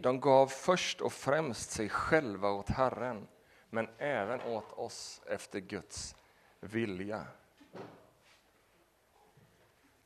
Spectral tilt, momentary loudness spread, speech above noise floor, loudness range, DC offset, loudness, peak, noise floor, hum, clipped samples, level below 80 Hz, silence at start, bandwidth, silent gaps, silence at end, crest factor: -4.5 dB/octave; 17 LU; 35 dB; 12 LU; under 0.1%; -34 LUFS; -12 dBFS; -69 dBFS; none; under 0.1%; -60 dBFS; 0 s; 13.5 kHz; none; 2.1 s; 24 dB